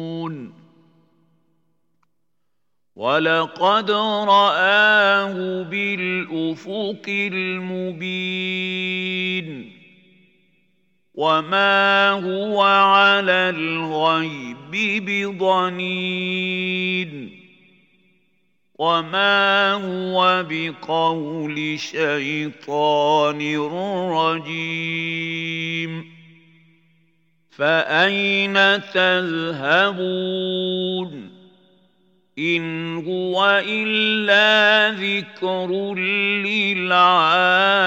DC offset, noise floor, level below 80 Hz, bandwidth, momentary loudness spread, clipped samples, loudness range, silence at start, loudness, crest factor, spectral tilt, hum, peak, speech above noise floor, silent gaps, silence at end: under 0.1%; -79 dBFS; -82 dBFS; 16.5 kHz; 12 LU; under 0.1%; 8 LU; 0 s; -19 LUFS; 18 dB; -5 dB/octave; none; -2 dBFS; 60 dB; none; 0 s